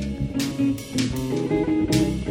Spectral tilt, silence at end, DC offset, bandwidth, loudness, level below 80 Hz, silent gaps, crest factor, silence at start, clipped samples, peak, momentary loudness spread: -6 dB/octave; 0 s; under 0.1%; 16.5 kHz; -24 LUFS; -38 dBFS; none; 16 dB; 0 s; under 0.1%; -8 dBFS; 5 LU